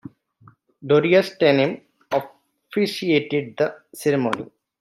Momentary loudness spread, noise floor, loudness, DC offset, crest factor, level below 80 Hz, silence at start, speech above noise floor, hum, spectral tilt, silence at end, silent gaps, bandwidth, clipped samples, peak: 13 LU; -54 dBFS; -21 LUFS; under 0.1%; 18 dB; -68 dBFS; 0.8 s; 34 dB; none; -6 dB/octave; 0.35 s; none; 13.5 kHz; under 0.1%; -4 dBFS